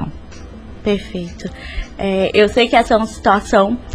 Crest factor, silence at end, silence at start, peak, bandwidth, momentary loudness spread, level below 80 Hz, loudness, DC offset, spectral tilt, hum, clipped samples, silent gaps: 16 dB; 0 s; 0 s; 0 dBFS; 13 kHz; 20 LU; -34 dBFS; -15 LUFS; under 0.1%; -5 dB/octave; none; under 0.1%; none